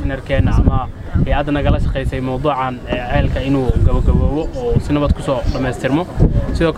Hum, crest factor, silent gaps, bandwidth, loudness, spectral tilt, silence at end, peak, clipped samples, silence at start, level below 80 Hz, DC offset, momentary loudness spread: none; 16 dB; none; 11 kHz; -17 LUFS; -8 dB/octave; 0 s; 0 dBFS; under 0.1%; 0 s; -20 dBFS; under 0.1%; 5 LU